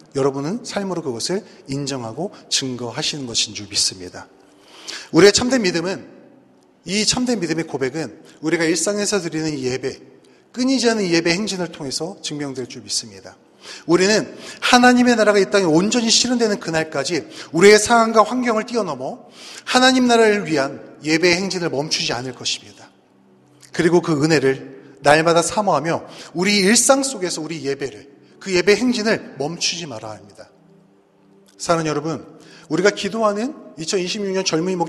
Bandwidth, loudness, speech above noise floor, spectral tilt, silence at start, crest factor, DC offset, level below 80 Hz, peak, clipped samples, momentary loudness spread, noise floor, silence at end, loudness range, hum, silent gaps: 13.5 kHz; -18 LUFS; 35 dB; -3.5 dB/octave; 0.15 s; 20 dB; under 0.1%; -56 dBFS; 0 dBFS; under 0.1%; 16 LU; -54 dBFS; 0 s; 7 LU; none; none